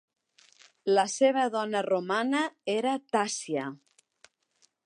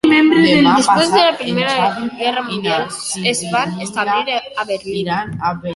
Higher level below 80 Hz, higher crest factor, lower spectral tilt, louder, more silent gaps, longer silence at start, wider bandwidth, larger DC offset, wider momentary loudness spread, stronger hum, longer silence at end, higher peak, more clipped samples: second, -84 dBFS vs -52 dBFS; first, 20 dB vs 14 dB; about the same, -3.5 dB/octave vs -4 dB/octave; second, -28 LUFS vs -15 LUFS; neither; first, 0.85 s vs 0.05 s; about the same, 11.5 kHz vs 11.5 kHz; neither; about the same, 9 LU vs 11 LU; neither; first, 1.1 s vs 0 s; second, -10 dBFS vs 0 dBFS; neither